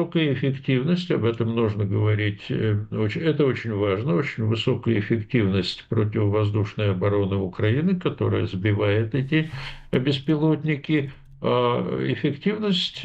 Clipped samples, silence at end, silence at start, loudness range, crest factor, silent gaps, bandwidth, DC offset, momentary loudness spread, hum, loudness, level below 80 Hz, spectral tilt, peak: under 0.1%; 0 s; 0 s; 1 LU; 16 dB; none; 8 kHz; under 0.1%; 3 LU; none; -23 LUFS; -52 dBFS; -8 dB/octave; -8 dBFS